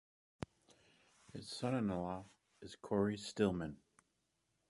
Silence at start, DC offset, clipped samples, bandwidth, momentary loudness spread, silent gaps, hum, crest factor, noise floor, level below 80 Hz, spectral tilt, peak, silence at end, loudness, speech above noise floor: 1.35 s; under 0.1%; under 0.1%; 11.5 kHz; 18 LU; none; none; 22 dB; -83 dBFS; -66 dBFS; -6 dB/octave; -20 dBFS; 0.95 s; -40 LUFS; 44 dB